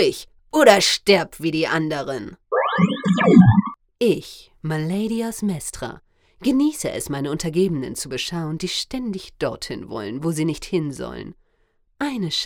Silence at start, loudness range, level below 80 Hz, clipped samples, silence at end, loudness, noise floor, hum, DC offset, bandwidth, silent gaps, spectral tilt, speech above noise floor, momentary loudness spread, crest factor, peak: 0 s; 8 LU; -48 dBFS; under 0.1%; 0 s; -21 LUFS; -64 dBFS; none; under 0.1%; 19 kHz; none; -5 dB/octave; 43 dB; 17 LU; 20 dB; 0 dBFS